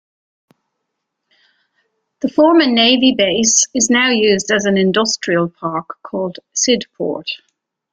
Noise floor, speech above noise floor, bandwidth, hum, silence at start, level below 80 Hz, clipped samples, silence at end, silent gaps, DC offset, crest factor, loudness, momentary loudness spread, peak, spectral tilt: -75 dBFS; 61 dB; 10 kHz; none; 2.25 s; -58 dBFS; under 0.1%; 0.55 s; none; under 0.1%; 16 dB; -14 LUFS; 13 LU; -2 dBFS; -2.5 dB/octave